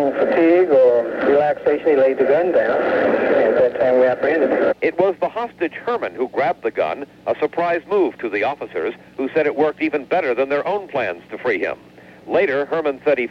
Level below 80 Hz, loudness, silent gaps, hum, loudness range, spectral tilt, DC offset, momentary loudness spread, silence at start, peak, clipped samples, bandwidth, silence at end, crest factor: -60 dBFS; -18 LUFS; none; none; 6 LU; -7 dB/octave; under 0.1%; 9 LU; 0 s; -4 dBFS; under 0.1%; 6.2 kHz; 0 s; 14 dB